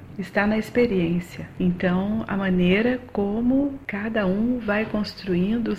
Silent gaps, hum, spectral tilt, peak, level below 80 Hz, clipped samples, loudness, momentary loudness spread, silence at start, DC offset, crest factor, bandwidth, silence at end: none; none; -8 dB/octave; -8 dBFS; -46 dBFS; under 0.1%; -23 LUFS; 6 LU; 0 s; 0.3%; 16 dB; 13 kHz; 0 s